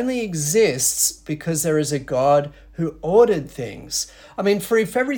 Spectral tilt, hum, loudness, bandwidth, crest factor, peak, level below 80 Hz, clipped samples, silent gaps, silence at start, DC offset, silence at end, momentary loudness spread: -4 dB/octave; none; -20 LUFS; 18 kHz; 16 dB; -4 dBFS; -50 dBFS; under 0.1%; none; 0 s; under 0.1%; 0 s; 12 LU